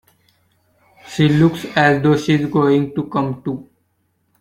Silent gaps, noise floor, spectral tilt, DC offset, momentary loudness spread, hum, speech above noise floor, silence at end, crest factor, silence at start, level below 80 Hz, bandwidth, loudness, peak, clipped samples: none; -65 dBFS; -7 dB/octave; under 0.1%; 13 LU; none; 50 dB; 0.8 s; 16 dB; 1.05 s; -52 dBFS; 14 kHz; -16 LUFS; -2 dBFS; under 0.1%